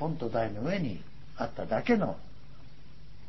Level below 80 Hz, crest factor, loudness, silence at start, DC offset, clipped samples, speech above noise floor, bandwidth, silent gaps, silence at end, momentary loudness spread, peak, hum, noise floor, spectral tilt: -54 dBFS; 20 dB; -32 LUFS; 0 s; 1%; under 0.1%; 22 dB; 6 kHz; none; 0 s; 16 LU; -14 dBFS; none; -53 dBFS; -8 dB/octave